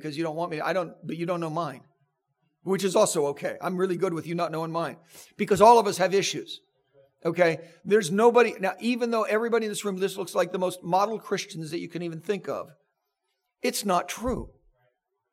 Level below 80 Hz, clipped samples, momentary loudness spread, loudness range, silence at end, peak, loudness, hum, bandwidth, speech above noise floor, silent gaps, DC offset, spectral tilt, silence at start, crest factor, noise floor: -58 dBFS; under 0.1%; 15 LU; 7 LU; 0.85 s; -4 dBFS; -26 LUFS; none; 16 kHz; 54 dB; none; under 0.1%; -4.5 dB/octave; 0 s; 22 dB; -80 dBFS